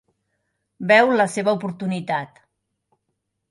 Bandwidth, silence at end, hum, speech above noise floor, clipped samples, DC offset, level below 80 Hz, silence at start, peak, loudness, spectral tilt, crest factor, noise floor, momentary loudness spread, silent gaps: 11.5 kHz; 1.25 s; none; 57 dB; under 0.1%; under 0.1%; -70 dBFS; 0.8 s; -2 dBFS; -19 LUFS; -5 dB/octave; 22 dB; -76 dBFS; 14 LU; none